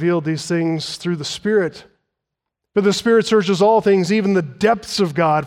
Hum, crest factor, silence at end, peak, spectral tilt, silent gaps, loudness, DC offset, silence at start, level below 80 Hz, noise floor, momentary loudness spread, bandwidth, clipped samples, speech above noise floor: none; 14 dB; 0 s; -4 dBFS; -5.5 dB/octave; none; -18 LUFS; under 0.1%; 0 s; -58 dBFS; -81 dBFS; 8 LU; 15 kHz; under 0.1%; 64 dB